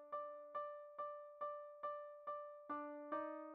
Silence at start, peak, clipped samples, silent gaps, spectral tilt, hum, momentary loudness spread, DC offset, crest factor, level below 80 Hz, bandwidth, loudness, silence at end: 0 s; -32 dBFS; under 0.1%; none; -3 dB/octave; none; 4 LU; under 0.1%; 18 dB; under -90 dBFS; 4.4 kHz; -50 LUFS; 0 s